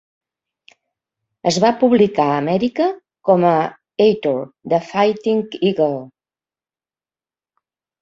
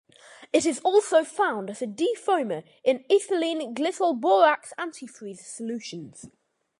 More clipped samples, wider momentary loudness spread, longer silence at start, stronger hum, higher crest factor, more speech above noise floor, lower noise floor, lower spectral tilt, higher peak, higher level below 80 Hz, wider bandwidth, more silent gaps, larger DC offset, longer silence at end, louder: neither; second, 8 LU vs 18 LU; first, 1.45 s vs 0.3 s; neither; about the same, 18 dB vs 20 dB; first, over 74 dB vs 26 dB; first, under -90 dBFS vs -51 dBFS; first, -6 dB/octave vs -3.5 dB/octave; first, -2 dBFS vs -6 dBFS; first, -62 dBFS vs -74 dBFS; second, 8 kHz vs 11.5 kHz; neither; neither; first, 1.95 s vs 0.5 s; first, -17 LUFS vs -25 LUFS